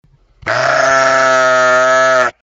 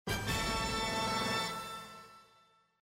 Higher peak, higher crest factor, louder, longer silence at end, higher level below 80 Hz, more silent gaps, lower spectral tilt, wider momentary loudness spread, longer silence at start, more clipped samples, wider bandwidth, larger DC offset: first, 0 dBFS vs -22 dBFS; about the same, 12 dB vs 14 dB; first, -10 LUFS vs -34 LUFS; second, 0.15 s vs 0.65 s; about the same, -52 dBFS vs -50 dBFS; neither; about the same, -2.5 dB/octave vs -3 dB/octave; second, 6 LU vs 14 LU; first, 0.45 s vs 0.05 s; neither; second, 8 kHz vs 16 kHz; neither